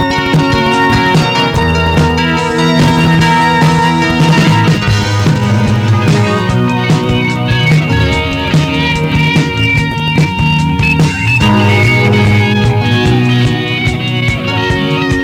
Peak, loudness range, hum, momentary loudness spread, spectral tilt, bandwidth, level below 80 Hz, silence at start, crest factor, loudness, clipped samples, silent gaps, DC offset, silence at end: -2 dBFS; 2 LU; none; 4 LU; -6 dB/octave; 15.5 kHz; -26 dBFS; 0 s; 8 dB; -10 LUFS; under 0.1%; none; under 0.1%; 0 s